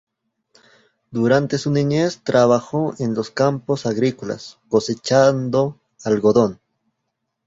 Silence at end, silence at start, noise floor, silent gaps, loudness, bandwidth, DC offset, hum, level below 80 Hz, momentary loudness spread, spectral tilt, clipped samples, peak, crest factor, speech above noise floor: 0.9 s; 1.1 s; -76 dBFS; none; -19 LUFS; 8 kHz; under 0.1%; none; -56 dBFS; 9 LU; -6 dB/octave; under 0.1%; -2 dBFS; 18 dB; 58 dB